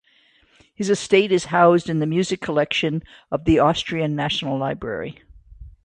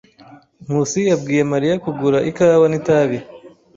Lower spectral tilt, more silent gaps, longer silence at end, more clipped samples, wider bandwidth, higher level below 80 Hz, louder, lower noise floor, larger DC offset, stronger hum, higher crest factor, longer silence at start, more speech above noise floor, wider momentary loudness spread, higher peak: about the same, -5.5 dB/octave vs -6 dB/octave; neither; second, 0.15 s vs 0.3 s; neither; first, 10 kHz vs 7.8 kHz; first, -46 dBFS vs -56 dBFS; second, -20 LUFS vs -17 LUFS; first, -58 dBFS vs -45 dBFS; neither; neither; about the same, 18 dB vs 14 dB; first, 0.8 s vs 0.3 s; first, 38 dB vs 29 dB; first, 13 LU vs 7 LU; about the same, -2 dBFS vs -4 dBFS